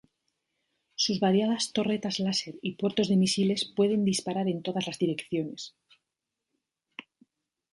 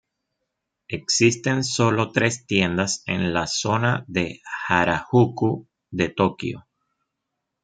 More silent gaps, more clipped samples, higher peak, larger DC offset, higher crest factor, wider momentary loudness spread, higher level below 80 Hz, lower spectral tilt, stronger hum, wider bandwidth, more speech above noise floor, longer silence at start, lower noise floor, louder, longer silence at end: neither; neither; second, -12 dBFS vs -2 dBFS; neither; about the same, 16 dB vs 20 dB; first, 18 LU vs 12 LU; second, -70 dBFS vs -56 dBFS; about the same, -5 dB/octave vs -4.5 dB/octave; neither; first, 11.5 kHz vs 9.4 kHz; about the same, 59 dB vs 59 dB; about the same, 1 s vs 0.9 s; first, -86 dBFS vs -81 dBFS; second, -28 LUFS vs -22 LUFS; second, 0.75 s vs 1.05 s